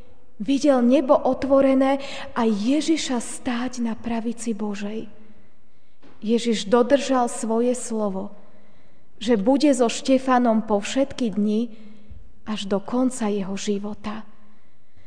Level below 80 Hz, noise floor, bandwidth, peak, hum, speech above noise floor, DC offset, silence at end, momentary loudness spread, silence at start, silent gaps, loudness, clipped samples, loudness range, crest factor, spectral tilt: -56 dBFS; -62 dBFS; 10 kHz; -4 dBFS; none; 41 dB; 2%; 0.85 s; 14 LU; 0.4 s; none; -22 LUFS; under 0.1%; 7 LU; 18 dB; -5 dB/octave